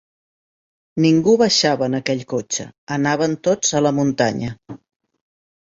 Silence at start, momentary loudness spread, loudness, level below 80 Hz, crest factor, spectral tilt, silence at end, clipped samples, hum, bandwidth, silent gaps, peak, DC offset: 0.95 s; 13 LU; -18 LUFS; -56 dBFS; 18 dB; -4.5 dB/octave; 1 s; under 0.1%; none; 8 kHz; 2.78-2.87 s; -2 dBFS; under 0.1%